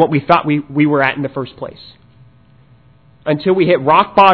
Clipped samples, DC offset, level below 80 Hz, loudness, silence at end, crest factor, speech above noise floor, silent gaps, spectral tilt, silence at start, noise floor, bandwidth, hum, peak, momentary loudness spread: 0.3%; 0.2%; -52 dBFS; -14 LUFS; 0 s; 14 dB; 35 dB; none; -8.5 dB/octave; 0 s; -48 dBFS; 5.4 kHz; none; 0 dBFS; 15 LU